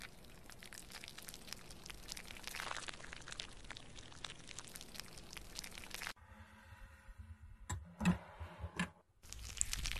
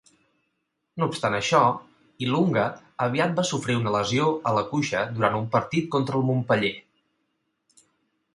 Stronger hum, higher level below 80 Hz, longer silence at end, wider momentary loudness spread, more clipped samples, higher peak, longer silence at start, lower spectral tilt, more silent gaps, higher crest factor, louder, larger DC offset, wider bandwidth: neither; first, -56 dBFS vs -62 dBFS; second, 0 s vs 1.55 s; first, 19 LU vs 7 LU; neither; second, -14 dBFS vs -4 dBFS; second, 0 s vs 0.95 s; second, -3 dB/octave vs -5.5 dB/octave; neither; first, 34 dB vs 22 dB; second, -46 LUFS vs -24 LUFS; neither; first, 14 kHz vs 11.5 kHz